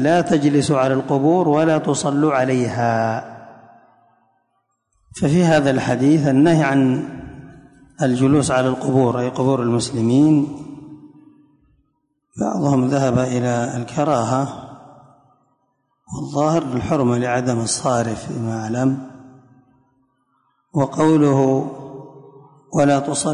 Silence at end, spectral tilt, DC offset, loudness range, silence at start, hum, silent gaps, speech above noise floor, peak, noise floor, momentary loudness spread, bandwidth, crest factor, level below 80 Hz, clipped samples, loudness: 0 s; -6 dB/octave; under 0.1%; 5 LU; 0 s; none; none; 52 dB; -4 dBFS; -69 dBFS; 14 LU; 11 kHz; 14 dB; -52 dBFS; under 0.1%; -18 LUFS